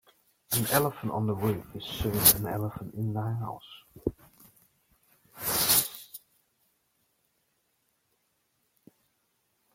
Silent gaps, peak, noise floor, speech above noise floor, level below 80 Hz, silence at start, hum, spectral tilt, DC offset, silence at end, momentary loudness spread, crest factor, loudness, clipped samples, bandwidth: none; -2 dBFS; -75 dBFS; 46 dB; -54 dBFS; 0.5 s; none; -3.5 dB/octave; under 0.1%; 3.55 s; 19 LU; 30 dB; -27 LUFS; under 0.1%; 16.5 kHz